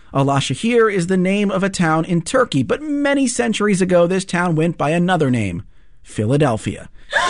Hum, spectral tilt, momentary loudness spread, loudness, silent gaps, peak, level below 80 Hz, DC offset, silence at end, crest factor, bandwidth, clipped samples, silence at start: none; -5.5 dB/octave; 7 LU; -17 LUFS; none; -4 dBFS; -46 dBFS; under 0.1%; 0 s; 12 dB; 11 kHz; under 0.1%; 0.1 s